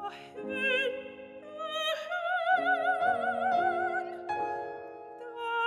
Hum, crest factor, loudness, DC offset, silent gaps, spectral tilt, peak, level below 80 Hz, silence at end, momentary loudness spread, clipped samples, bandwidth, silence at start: none; 16 dB; -30 LUFS; under 0.1%; none; -3 dB/octave; -16 dBFS; -74 dBFS; 0 s; 16 LU; under 0.1%; 14 kHz; 0 s